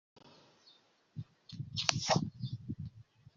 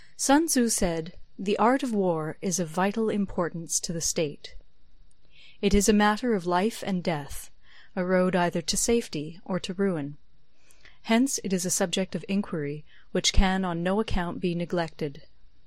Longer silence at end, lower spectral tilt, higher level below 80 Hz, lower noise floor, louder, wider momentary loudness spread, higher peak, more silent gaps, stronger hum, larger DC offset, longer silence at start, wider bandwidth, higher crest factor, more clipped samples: about the same, 0.35 s vs 0.45 s; about the same, -3.5 dB/octave vs -4 dB/octave; second, -68 dBFS vs -38 dBFS; first, -67 dBFS vs -61 dBFS; second, -36 LUFS vs -26 LUFS; first, 18 LU vs 12 LU; second, -8 dBFS vs -4 dBFS; neither; neither; second, under 0.1% vs 0.6%; about the same, 0.15 s vs 0.2 s; second, 7.4 kHz vs 16 kHz; first, 32 dB vs 22 dB; neither